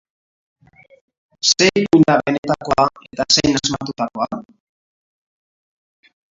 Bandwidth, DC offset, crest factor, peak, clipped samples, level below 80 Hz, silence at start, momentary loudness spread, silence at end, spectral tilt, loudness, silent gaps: 7.8 kHz; under 0.1%; 20 dB; 0 dBFS; under 0.1%; -50 dBFS; 1.45 s; 12 LU; 1.9 s; -3.5 dB/octave; -16 LUFS; 2.38-2.43 s